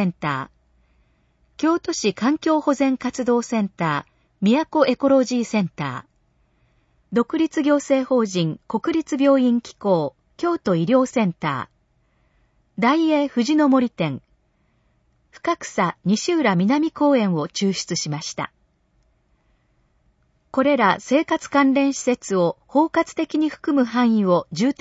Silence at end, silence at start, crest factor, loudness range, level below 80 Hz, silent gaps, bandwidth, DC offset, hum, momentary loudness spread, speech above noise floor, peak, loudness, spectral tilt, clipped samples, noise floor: 0.1 s; 0 s; 18 dB; 3 LU; -62 dBFS; none; 8 kHz; under 0.1%; none; 9 LU; 44 dB; -4 dBFS; -21 LUFS; -5.5 dB/octave; under 0.1%; -64 dBFS